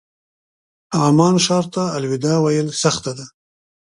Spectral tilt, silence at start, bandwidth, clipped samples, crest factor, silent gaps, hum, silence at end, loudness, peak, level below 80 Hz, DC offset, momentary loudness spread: -5 dB/octave; 0.9 s; 11.5 kHz; under 0.1%; 18 dB; none; none; 0.6 s; -17 LUFS; 0 dBFS; -58 dBFS; under 0.1%; 10 LU